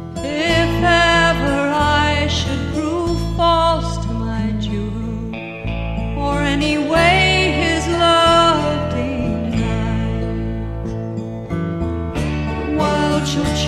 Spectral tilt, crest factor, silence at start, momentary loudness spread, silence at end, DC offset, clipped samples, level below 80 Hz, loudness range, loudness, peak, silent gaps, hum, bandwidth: -5 dB/octave; 16 dB; 0 s; 12 LU; 0 s; 0.2%; under 0.1%; -28 dBFS; 7 LU; -17 LUFS; -2 dBFS; none; none; 13.5 kHz